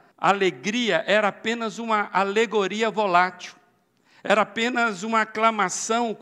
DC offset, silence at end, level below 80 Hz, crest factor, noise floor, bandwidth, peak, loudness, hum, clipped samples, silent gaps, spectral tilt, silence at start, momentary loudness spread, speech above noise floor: under 0.1%; 0.05 s; -80 dBFS; 20 dB; -63 dBFS; 13 kHz; -4 dBFS; -22 LUFS; none; under 0.1%; none; -3.5 dB/octave; 0.2 s; 6 LU; 40 dB